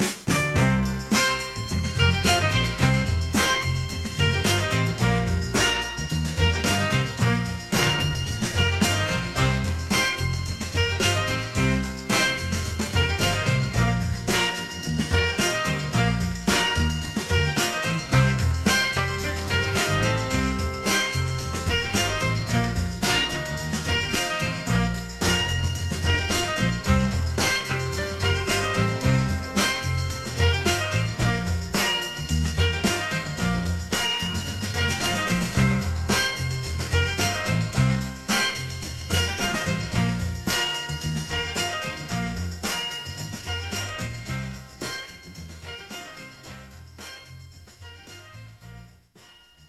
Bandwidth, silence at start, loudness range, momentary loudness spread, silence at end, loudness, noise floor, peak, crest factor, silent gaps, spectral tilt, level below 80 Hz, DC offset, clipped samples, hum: 15.5 kHz; 0 s; 8 LU; 9 LU; 0.05 s; -24 LUFS; -53 dBFS; -4 dBFS; 20 dB; none; -4 dB/octave; -38 dBFS; 0.1%; under 0.1%; none